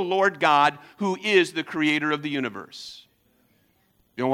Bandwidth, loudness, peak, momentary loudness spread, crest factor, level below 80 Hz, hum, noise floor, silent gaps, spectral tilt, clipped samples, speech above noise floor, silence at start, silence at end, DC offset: 14.5 kHz; -23 LUFS; -4 dBFS; 19 LU; 20 dB; -74 dBFS; none; -65 dBFS; none; -4.5 dB/octave; under 0.1%; 42 dB; 0 s; 0 s; under 0.1%